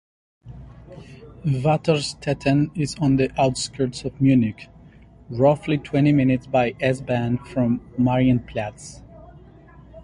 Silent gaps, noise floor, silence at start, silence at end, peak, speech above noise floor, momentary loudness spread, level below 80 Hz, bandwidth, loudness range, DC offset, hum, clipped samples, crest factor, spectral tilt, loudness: none; -47 dBFS; 0.45 s; 0 s; -4 dBFS; 26 dB; 17 LU; -46 dBFS; 11.5 kHz; 3 LU; under 0.1%; none; under 0.1%; 18 dB; -6.5 dB/octave; -21 LUFS